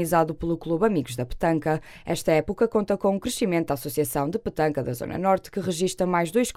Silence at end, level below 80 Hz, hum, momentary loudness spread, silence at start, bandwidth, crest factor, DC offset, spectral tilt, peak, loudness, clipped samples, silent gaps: 0 s; -46 dBFS; none; 6 LU; 0 s; 16 kHz; 16 dB; under 0.1%; -5.5 dB/octave; -8 dBFS; -25 LUFS; under 0.1%; none